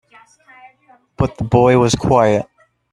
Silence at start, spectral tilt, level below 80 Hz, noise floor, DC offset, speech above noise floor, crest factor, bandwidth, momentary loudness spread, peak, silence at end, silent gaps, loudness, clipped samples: 1.2 s; -6 dB/octave; -40 dBFS; -52 dBFS; under 0.1%; 39 dB; 16 dB; 12 kHz; 9 LU; 0 dBFS; 0.5 s; none; -15 LUFS; under 0.1%